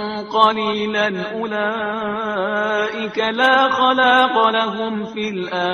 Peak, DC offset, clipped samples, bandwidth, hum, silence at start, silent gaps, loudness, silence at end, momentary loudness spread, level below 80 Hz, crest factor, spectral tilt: 0 dBFS; under 0.1%; under 0.1%; 10.5 kHz; none; 0 s; none; -18 LUFS; 0 s; 10 LU; -60 dBFS; 18 dB; -4.5 dB/octave